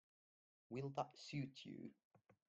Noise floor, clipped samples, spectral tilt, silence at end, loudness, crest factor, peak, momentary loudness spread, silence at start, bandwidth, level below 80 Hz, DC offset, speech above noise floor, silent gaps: under -90 dBFS; under 0.1%; -6 dB/octave; 0.15 s; -51 LUFS; 24 dB; -28 dBFS; 9 LU; 0.7 s; 8.2 kHz; -86 dBFS; under 0.1%; over 40 dB; 2.05-2.11 s